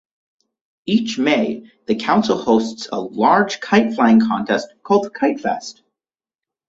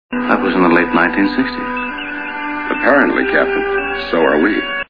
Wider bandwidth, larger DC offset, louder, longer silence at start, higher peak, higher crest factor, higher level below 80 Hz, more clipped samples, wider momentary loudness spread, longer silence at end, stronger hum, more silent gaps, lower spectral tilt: first, 7.8 kHz vs 5.2 kHz; second, under 0.1% vs 0.8%; second, -18 LUFS vs -15 LUFS; first, 0.85 s vs 0.1 s; about the same, -2 dBFS vs 0 dBFS; about the same, 18 dB vs 16 dB; second, -58 dBFS vs -44 dBFS; neither; about the same, 11 LU vs 10 LU; first, 0.95 s vs 0.05 s; neither; neither; second, -5.5 dB/octave vs -8 dB/octave